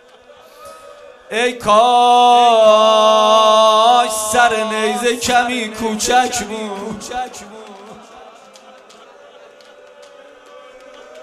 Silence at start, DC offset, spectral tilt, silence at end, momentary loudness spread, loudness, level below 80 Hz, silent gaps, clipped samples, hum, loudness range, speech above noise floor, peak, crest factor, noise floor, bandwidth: 0.6 s; under 0.1%; -2 dB/octave; 0 s; 16 LU; -13 LUFS; -52 dBFS; none; under 0.1%; none; 18 LU; 30 dB; 0 dBFS; 16 dB; -44 dBFS; 14.5 kHz